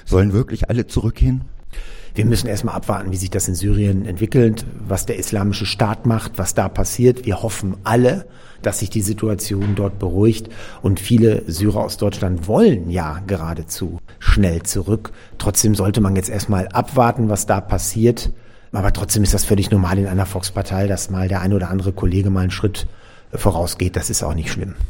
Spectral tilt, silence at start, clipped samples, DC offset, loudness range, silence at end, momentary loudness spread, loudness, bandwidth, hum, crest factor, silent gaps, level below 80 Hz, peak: -5.5 dB/octave; 0.05 s; under 0.1%; under 0.1%; 3 LU; 0 s; 9 LU; -19 LUFS; 17 kHz; none; 18 dB; none; -28 dBFS; 0 dBFS